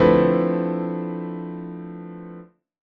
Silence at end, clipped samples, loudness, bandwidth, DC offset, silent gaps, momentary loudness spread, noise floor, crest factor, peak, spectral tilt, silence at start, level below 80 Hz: 0.55 s; under 0.1%; -23 LUFS; 5.4 kHz; under 0.1%; none; 20 LU; -43 dBFS; 20 dB; -2 dBFS; -10 dB/octave; 0 s; -48 dBFS